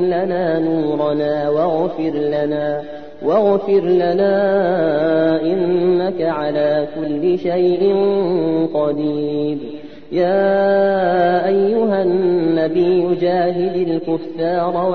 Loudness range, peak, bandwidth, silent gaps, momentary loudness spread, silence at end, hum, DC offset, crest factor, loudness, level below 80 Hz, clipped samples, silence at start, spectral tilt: 2 LU; -4 dBFS; 4.9 kHz; none; 6 LU; 0 s; none; 1%; 12 dB; -17 LUFS; -54 dBFS; under 0.1%; 0 s; -9.5 dB/octave